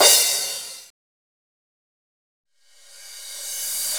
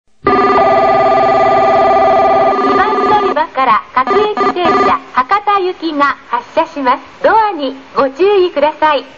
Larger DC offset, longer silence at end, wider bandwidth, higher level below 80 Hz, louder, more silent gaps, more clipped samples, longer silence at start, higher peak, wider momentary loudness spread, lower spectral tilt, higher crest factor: second, under 0.1% vs 0.5%; about the same, 0 s vs 0.1 s; first, over 20 kHz vs 7.6 kHz; second, -70 dBFS vs -44 dBFS; second, -20 LUFS vs -11 LUFS; first, 0.90-2.44 s vs none; neither; second, 0 s vs 0.25 s; about the same, 0 dBFS vs 0 dBFS; first, 25 LU vs 6 LU; second, 3 dB/octave vs -5.5 dB/octave; first, 24 dB vs 12 dB